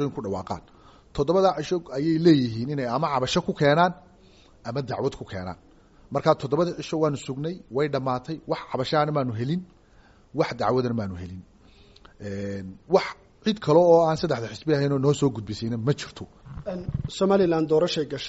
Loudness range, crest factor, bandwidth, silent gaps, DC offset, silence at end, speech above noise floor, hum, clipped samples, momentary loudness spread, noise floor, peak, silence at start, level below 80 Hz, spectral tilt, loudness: 6 LU; 20 dB; 8 kHz; none; under 0.1%; 0 s; 31 dB; none; under 0.1%; 16 LU; -55 dBFS; -4 dBFS; 0 s; -52 dBFS; -5.5 dB/octave; -25 LUFS